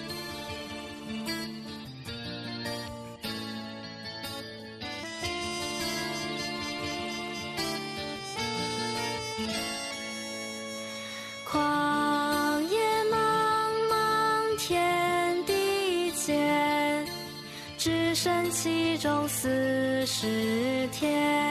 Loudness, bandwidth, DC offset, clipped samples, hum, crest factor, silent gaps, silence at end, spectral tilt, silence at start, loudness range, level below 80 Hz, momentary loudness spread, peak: -29 LUFS; 14 kHz; under 0.1%; under 0.1%; none; 14 dB; none; 0 s; -3.5 dB/octave; 0 s; 10 LU; -62 dBFS; 12 LU; -14 dBFS